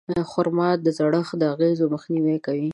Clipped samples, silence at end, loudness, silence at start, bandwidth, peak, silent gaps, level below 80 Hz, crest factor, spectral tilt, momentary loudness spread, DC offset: under 0.1%; 0 s; -22 LUFS; 0.1 s; 10.5 kHz; -6 dBFS; none; -60 dBFS; 16 dB; -8 dB/octave; 3 LU; under 0.1%